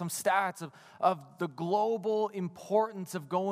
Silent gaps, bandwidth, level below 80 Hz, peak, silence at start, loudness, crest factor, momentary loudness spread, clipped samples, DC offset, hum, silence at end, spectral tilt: none; 15.5 kHz; -82 dBFS; -14 dBFS; 0 s; -31 LUFS; 18 dB; 10 LU; under 0.1%; under 0.1%; none; 0 s; -5 dB/octave